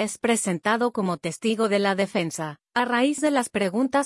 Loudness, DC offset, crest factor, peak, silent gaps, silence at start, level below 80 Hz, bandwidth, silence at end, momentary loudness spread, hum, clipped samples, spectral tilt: -24 LUFS; under 0.1%; 16 dB; -8 dBFS; none; 0 s; -68 dBFS; 12 kHz; 0 s; 5 LU; none; under 0.1%; -4 dB/octave